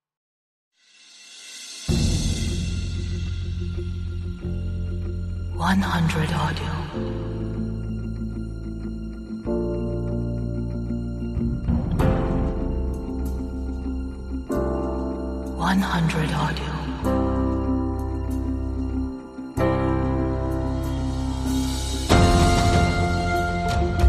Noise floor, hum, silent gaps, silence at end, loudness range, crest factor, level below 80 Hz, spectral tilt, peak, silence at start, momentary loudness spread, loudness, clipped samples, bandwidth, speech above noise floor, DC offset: -51 dBFS; none; none; 0 s; 7 LU; 20 dB; -30 dBFS; -6 dB/octave; -4 dBFS; 1.1 s; 10 LU; -25 LUFS; under 0.1%; 14.5 kHz; 28 dB; under 0.1%